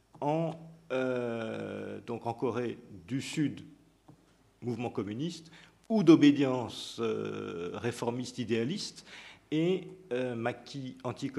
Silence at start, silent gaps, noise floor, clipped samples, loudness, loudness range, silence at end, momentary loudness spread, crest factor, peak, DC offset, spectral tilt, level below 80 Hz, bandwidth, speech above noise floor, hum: 0.15 s; none; -64 dBFS; under 0.1%; -32 LUFS; 9 LU; 0 s; 14 LU; 24 dB; -10 dBFS; under 0.1%; -6 dB/octave; -72 dBFS; 12 kHz; 32 dB; none